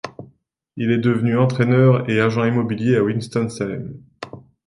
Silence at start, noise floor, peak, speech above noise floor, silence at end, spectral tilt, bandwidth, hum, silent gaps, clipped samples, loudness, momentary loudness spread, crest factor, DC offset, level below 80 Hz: 0.05 s; -55 dBFS; -4 dBFS; 37 dB; 0.25 s; -8 dB/octave; 11.5 kHz; none; none; under 0.1%; -18 LUFS; 21 LU; 16 dB; under 0.1%; -56 dBFS